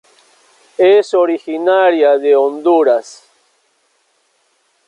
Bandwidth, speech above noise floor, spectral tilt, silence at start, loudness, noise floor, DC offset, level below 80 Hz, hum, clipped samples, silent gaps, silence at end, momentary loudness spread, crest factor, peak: 10.5 kHz; 49 dB; -4 dB/octave; 0.8 s; -12 LUFS; -60 dBFS; under 0.1%; -68 dBFS; none; under 0.1%; none; 1.75 s; 6 LU; 12 dB; -2 dBFS